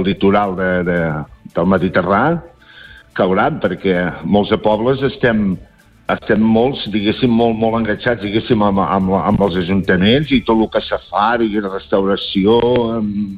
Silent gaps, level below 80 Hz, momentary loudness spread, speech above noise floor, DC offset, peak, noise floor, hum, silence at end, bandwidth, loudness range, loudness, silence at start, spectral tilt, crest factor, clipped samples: none; -40 dBFS; 7 LU; 25 dB; under 0.1%; -2 dBFS; -40 dBFS; none; 0 s; 5 kHz; 2 LU; -15 LUFS; 0 s; -8.5 dB/octave; 14 dB; under 0.1%